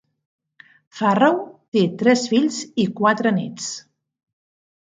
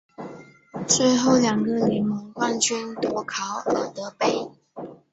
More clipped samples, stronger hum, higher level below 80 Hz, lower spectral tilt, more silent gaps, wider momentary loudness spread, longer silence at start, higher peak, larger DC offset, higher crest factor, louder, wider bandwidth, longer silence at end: neither; neither; second, -68 dBFS vs -62 dBFS; first, -5 dB/octave vs -3.5 dB/octave; first, 1.68-1.72 s vs none; second, 11 LU vs 21 LU; first, 0.95 s vs 0.2 s; first, -2 dBFS vs -6 dBFS; neither; about the same, 20 dB vs 18 dB; first, -20 LUFS vs -23 LUFS; first, 9.4 kHz vs 8.2 kHz; first, 1.15 s vs 0.2 s